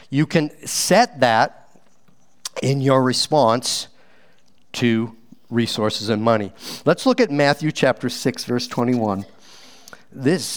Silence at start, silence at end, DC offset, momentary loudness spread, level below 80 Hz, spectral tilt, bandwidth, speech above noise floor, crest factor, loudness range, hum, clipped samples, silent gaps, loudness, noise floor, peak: 0.1 s; 0 s; 0.5%; 9 LU; -64 dBFS; -4.5 dB/octave; over 20 kHz; 41 dB; 20 dB; 3 LU; none; under 0.1%; none; -19 LUFS; -60 dBFS; 0 dBFS